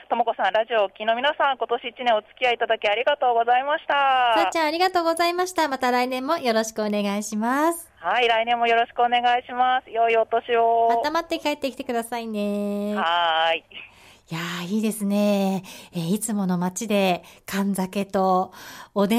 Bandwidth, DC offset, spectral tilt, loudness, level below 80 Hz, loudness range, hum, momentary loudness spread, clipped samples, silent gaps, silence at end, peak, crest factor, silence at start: 16 kHz; under 0.1%; -4.5 dB/octave; -23 LUFS; -64 dBFS; 4 LU; none; 8 LU; under 0.1%; none; 0 s; -10 dBFS; 14 dB; 0.1 s